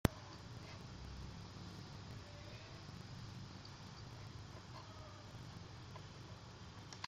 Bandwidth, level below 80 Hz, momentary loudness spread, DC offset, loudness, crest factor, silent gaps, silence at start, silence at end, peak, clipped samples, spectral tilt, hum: 15.5 kHz; -60 dBFS; 2 LU; under 0.1%; -52 LUFS; 38 dB; none; 0.05 s; 0 s; -12 dBFS; under 0.1%; -5.5 dB/octave; none